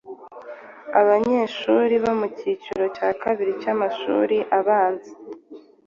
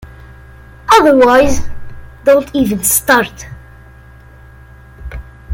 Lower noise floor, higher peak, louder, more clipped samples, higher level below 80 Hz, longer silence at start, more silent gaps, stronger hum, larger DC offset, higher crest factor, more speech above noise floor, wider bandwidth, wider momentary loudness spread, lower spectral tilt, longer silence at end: first, -45 dBFS vs -38 dBFS; second, -4 dBFS vs 0 dBFS; second, -21 LUFS vs -11 LUFS; neither; second, -64 dBFS vs -32 dBFS; about the same, 0.05 s vs 0 s; neither; neither; neither; about the same, 18 dB vs 14 dB; second, 24 dB vs 28 dB; second, 7.2 kHz vs 17 kHz; second, 21 LU vs 24 LU; first, -6 dB/octave vs -3.5 dB/octave; first, 0.3 s vs 0 s